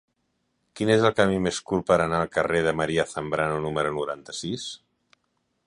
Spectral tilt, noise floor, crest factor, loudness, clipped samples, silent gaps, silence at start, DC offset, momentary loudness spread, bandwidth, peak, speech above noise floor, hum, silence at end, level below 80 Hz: -5 dB/octave; -74 dBFS; 22 dB; -25 LUFS; under 0.1%; none; 0.75 s; under 0.1%; 11 LU; 11 kHz; -4 dBFS; 50 dB; none; 0.9 s; -52 dBFS